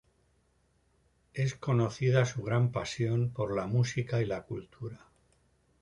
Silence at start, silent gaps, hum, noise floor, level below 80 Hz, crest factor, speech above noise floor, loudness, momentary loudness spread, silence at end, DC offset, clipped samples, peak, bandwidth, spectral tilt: 1.35 s; none; none; -71 dBFS; -60 dBFS; 20 dB; 40 dB; -31 LUFS; 15 LU; 0.85 s; under 0.1%; under 0.1%; -12 dBFS; 10.5 kHz; -6.5 dB/octave